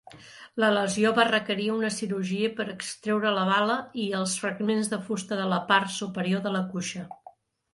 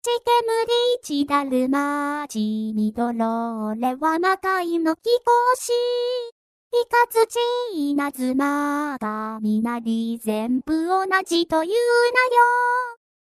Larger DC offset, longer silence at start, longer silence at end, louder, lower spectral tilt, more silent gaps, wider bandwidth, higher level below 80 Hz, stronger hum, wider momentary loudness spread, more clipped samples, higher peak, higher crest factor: neither; about the same, 0.1 s vs 0.05 s; first, 0.45 s vs 0.3 s; second, -26 LUFS vs -21 LUFS; about the same, -4 dB/octave vs -4 dB/octave; second, none vs 6.32-6.71 s; second, 11.5 kHz vs 14.5 kHz; second, -70 dBFS vs -62 dBFS; neither; about the same, 10 LU vs 8 LU; neither; about the same, -6 dBFS vs -4 dBFS; about the same, 20 dB vs 16 dB